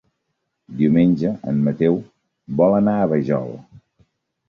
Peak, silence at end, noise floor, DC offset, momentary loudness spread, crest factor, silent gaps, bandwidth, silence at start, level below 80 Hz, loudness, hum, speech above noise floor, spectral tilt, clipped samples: -4 dBFS; 0.85 s; -75 dBFS; under 0.1%; 12 LU; 16 dB; none; 5.8 kHz; 0.7 s; -54 dBFS; -19 LUFS; none; 57 dB; -10.5 dB/octave; under 0.1%